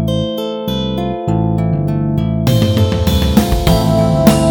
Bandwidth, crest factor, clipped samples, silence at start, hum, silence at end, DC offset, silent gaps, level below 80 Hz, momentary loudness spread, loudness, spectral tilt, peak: over 20 kHz; 14 dB; under 0.1%; 0 s; none; 0 s; under 0.1%; none; -24 dBFS; 8 LU; -14 LUFS; -6.5 dB/octave; 0 dBFS